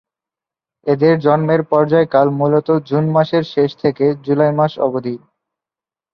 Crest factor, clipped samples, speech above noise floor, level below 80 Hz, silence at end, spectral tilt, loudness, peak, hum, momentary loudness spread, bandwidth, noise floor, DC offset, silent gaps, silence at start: 16 dB; under 0.1%; 75 dB; -60 dBFS; 0.95 s; -9.5 dB/octave; -15 LUFS; 0 dBFS; none; 6 LU; 6 kHz; -90 dBFS; under 0.1%; none; 0.85 s